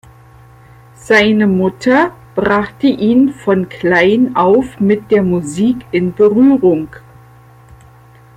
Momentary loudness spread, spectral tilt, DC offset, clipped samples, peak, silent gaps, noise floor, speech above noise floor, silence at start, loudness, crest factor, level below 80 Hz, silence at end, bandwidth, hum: 7 LU; -6.5 dB/octave; under 0.1%; under 0.1%; 0 dBFS; none; -42 dBFS; 30 dB; 1.05 s; -12 LUFS; 14 dB; -46 dBFS; 1.4 s; 11 kHz; none